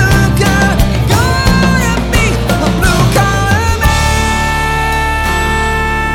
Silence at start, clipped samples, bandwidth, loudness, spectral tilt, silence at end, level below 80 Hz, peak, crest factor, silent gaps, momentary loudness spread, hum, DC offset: 0 s; under 0.1%; 19 kHz; -11 LUFS; -5 dB/octave; 0 s; -16 dBFS; 0 dBFS; 10 dB; none; 3 LU; none; under 0.1%